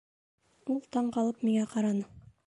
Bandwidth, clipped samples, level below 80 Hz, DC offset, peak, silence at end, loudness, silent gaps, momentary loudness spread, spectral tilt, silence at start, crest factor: 11 kHz; under 0.1%; -68 dBFS; under 0.1%; -18 dBFS; 0.25 s; -31 LUFS; none; 9 LU; -6.5 dB/octave; 0.65 s; 14 dB